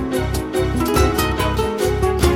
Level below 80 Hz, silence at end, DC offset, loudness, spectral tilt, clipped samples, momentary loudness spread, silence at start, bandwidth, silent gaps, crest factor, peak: -24 dBFS; 0 s; under 0.1%; -19 LUFS; -5.5 dB/octave; under 0.1%; 5 LU; 0 s; 16.5 kHz; none; 14 dB; -4 dBFS